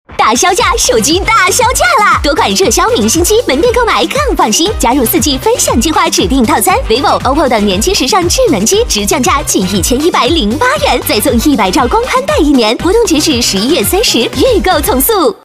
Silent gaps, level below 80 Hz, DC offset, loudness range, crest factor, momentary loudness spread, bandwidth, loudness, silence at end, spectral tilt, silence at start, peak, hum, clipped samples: none; -24 dBFS; 0.2%; 1 LU; 10 dB; 2 LU; 16 kHz; -9 LUFS; 0.1 s; -3 dB/octave; 0.1 s; 0 dBFS; none; under 0.1%